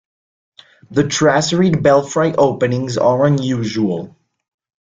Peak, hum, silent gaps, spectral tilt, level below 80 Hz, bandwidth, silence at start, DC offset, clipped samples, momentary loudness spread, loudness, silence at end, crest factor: -2 dBFS; none; none; -5.5 dB/octave; -50 dBFS; 9.4 kHz; 0.9 s; under 0.1%; under 0.1%; 7 LU; -15 LUFS; 0.8 s; 14 dB